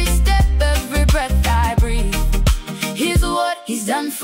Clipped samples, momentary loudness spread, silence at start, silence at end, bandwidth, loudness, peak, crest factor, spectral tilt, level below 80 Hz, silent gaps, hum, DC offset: under 0.1%; 5 LU; 0 s; 0 s; 16.5 kHz; -18 LUFS; -6 dBFS; 10 dB; -4.5 dB/octave; -18 dBFS; none; none; under 0.1%